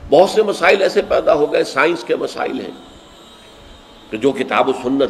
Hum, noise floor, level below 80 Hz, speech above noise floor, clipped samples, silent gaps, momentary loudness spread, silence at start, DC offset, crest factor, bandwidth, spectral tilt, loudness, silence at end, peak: none; -41 dBFS; -48 dBFS; 26 dB; under 0.1%; none; 11 LU; 0 s; under 0.1%; 16 dB; 14 kHz; -4.5 dB/octave; -16 LUFS; 0 s; 0 dBFS